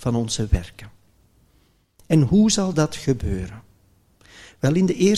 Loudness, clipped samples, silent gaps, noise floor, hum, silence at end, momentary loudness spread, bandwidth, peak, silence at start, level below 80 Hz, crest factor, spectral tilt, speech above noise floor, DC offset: -21 LUFS; under 0.1%; none; -60 dBFS; none; 0 s; 12 LU; 13.5 kHz; -4 dBFS; 0 s; -36 dBFS; 18 dB; -6 dB/octave; 41 dB; under 0.1%